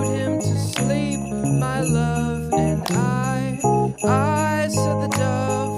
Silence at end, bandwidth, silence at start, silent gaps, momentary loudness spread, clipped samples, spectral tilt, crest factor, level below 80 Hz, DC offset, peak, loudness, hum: 0 s; 15.5 kHz; 0 s; none; 3 LU; under 0.1%; -6 dB/octave; 14 dB; -42 dBFS; under 0.1%; -6 dBFS; -21 LUFS; none